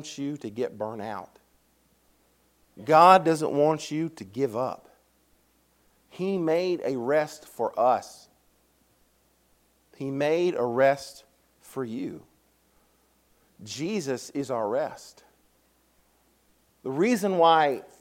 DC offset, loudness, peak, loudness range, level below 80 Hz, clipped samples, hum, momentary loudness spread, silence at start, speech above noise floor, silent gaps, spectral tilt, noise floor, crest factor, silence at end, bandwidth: under 0.1%; -25 LUFS; -2 dBFS; 10 LU; -72 dBFS; under 0.1%; none; 18 LU; 0 s; 41 dB; none; -5.5 dB/octave; -66 dBFS; 24 dB; 0.2 s; 16.5 kHz